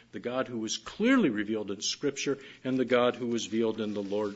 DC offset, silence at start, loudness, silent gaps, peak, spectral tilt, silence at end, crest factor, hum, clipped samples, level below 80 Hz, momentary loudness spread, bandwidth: under 0.1%; 0.15 s; -30 LUFS; none; -12 dBFS; -4 dB/octave; 0 s; 18 dB; none; under 0.1%; -70 dBFS; 8 LU; 8 kHz